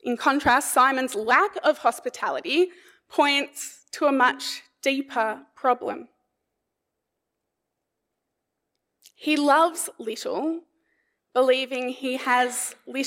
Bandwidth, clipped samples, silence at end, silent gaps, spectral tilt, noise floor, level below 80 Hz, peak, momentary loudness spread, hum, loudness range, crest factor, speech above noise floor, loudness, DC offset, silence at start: 16 kHz; under 0.1%; 0 s; none; -2 dB/octave; -82 dBFS; -64 dBFS; -4 dBFS; 11 LU; none; 9 LU; 20 dB; 58 dB; -23 LUFS; under 0.1%; 0.05 s